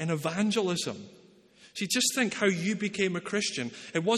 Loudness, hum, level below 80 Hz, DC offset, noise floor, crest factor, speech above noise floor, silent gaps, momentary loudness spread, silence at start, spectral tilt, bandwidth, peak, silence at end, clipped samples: -29 LUFS; none; -72 dBFS; under 0.1%; -57 dBFS; 18 dB; 28 dB; none; 10 LU; 0 s; -3.5 dB/octave; 13.5 kHz; -12 dBFS; 0 s; under 0.1%